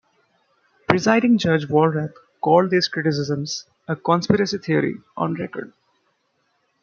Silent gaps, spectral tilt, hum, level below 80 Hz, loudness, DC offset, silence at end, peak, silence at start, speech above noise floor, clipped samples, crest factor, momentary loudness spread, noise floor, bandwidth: none; -6 dB/octave; none; -60 dBFS; -20 LUFS; under 0.1%; 1.15 s; 0 dBFS; 0.9 s; 49 dB; under 0.1%; 22 dB; 14 LU; -68 dBFS; 7.2 kHz